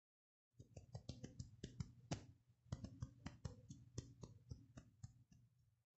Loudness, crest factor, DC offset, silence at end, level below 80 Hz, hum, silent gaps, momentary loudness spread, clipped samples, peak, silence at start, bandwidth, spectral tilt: -57 LUFS; 26 dB; under 0.1%; 0.3 s; -68 dBFS; none; none; 10 LU; under 0.1%; -32 dBFS; 0.55 s; 8 kHz; -6.5 dB/octave